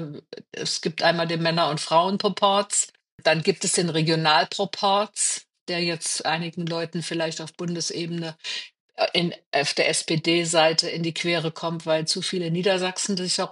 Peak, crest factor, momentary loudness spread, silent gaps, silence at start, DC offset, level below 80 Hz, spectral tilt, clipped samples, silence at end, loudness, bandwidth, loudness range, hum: -4 dBFS; 20 dB; 10 LU; 3.12-3.18 s, 5.61-5.66 s, 8.80-8.89 s, 9.46-9.51 s; 0 s; under 0.1%; -76 dBFS; -3 dB/octave; under 0.1%; 0 s; -23 LUFS; 11.5 kHz; 5 LU; none